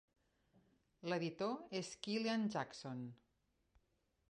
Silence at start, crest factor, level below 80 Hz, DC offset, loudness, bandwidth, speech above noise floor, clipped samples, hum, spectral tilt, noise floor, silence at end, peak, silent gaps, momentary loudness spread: 1.05 s; 20 dB; -82 dBFS; under 0.1%; -43 LUFS; 11 kHz; 40 dB; under 0.1%; none; -5 dB/octave; -82 dBFS; 1.15 s; -26 dBFS; none; 11 LU